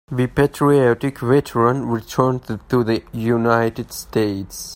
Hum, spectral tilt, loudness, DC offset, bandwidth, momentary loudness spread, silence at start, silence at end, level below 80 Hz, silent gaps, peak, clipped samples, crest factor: none; -6.5 dB/octave; -19 LUFS; under 0.1%; 16.5 kHz; 8 LU; 0.1 s; 0 s; -46 dBFS; none; 0 dBFS; under 0.1%; 18 dB